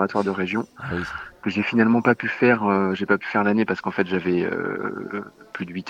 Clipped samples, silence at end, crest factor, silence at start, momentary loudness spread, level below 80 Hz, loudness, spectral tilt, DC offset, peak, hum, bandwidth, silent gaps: under 0.1%; 0 s; 18 dB; 0 s; 13 LU; -58 dBFS; -22 LUFS; -7.5 dB/octave; under 0.1%; -4 dBFS; none; 8.6 kHz; none